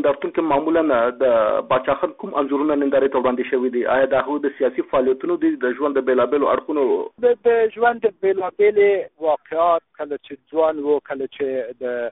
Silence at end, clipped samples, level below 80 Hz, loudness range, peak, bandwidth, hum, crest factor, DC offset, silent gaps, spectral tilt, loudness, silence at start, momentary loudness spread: 0 s; under 0.1%; -58 dBFS; 2 LU; -6 dBFS; 4 kHz; none; 14 dB; under 0.1%; none; -3.5 dB/octave; -20 LUFS; 0 s; 7 LU